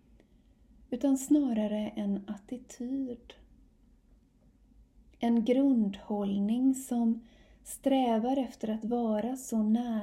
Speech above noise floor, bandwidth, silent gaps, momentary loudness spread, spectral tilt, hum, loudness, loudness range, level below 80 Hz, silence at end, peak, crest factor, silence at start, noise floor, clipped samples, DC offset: 33 dB; 15.5 kHz; none; 13 LU; -6 dB/octave; none; -31 LUFS; 9 LU; -62 dBFS; 0 s; -16 dBFS; 16 dB; 0.9 s; -63 dBFS; under 0.1%; under 0.1%